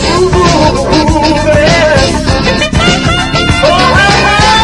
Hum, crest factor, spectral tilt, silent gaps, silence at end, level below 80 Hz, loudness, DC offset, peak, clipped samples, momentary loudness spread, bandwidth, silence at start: none; 8 dB; -4.5 dB/octave; none; 0 s; -20 dBFS; -7 LUFS; under 0.1%; 0 dBFS; 0.8%; 4 LU; 12 kHz; 0 s